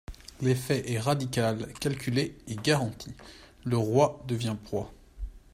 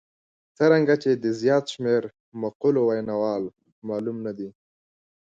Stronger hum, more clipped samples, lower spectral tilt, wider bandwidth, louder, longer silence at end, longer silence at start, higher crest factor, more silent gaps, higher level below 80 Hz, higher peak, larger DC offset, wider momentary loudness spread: neither; neither; about the same, -5.5 dB/octave vs -6.5 dB/octave; first, 16 kHz vs 7.8 kHz; second, -29 LUFS vs -24 LUFS; second, 0.15 s vs 0.7 s; second, 0.1 s vs 0.6 s; about the same, 20 dB vs 18 dB; second, none vs 2.20-2.32 s, 2.55-2.60 s, 3.72-3.82 s; first, -50 dBFS vs -68 dBFS; second, -10 dBFS vs -6 dBFS; neither; first, 19 LU vs 16 LU